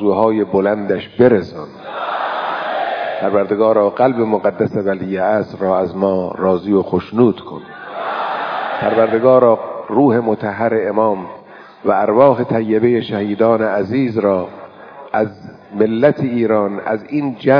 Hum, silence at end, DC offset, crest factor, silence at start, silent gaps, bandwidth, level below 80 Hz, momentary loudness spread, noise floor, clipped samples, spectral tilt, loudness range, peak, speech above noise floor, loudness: none; 0 s; under 0.1%; 16 dB; 0 s; none; 5.4 kHz; -56 dBFS; 11 LU; -36 dBFS; under 0.1%; -9.5 dB/octave; 3 LU; 0 dBFS; 21 dB; -16 LUFS